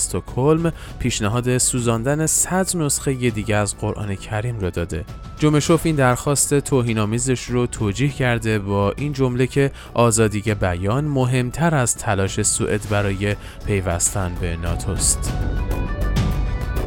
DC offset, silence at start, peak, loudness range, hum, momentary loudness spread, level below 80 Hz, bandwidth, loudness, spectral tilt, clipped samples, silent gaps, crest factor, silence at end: under 0.1%; 0 s; -2 dBFS; 3 LU; none; 8 LU; -30 dBFS; 18 kHz; -20 LUFS; -4.5 dB/octave; under 0.1%; none; 18 dB; 0 s